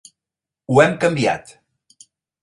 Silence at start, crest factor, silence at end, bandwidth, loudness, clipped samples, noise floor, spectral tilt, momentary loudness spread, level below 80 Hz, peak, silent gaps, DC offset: 0.7 s; 20 dB; 1.05 s; 11.5 kHz; -17 LUFS; under 0.1%; -87 dBFS; -5.5 dB/octave; 8 LU; -56 dBFS; 0 dBFS; none; under 0.1%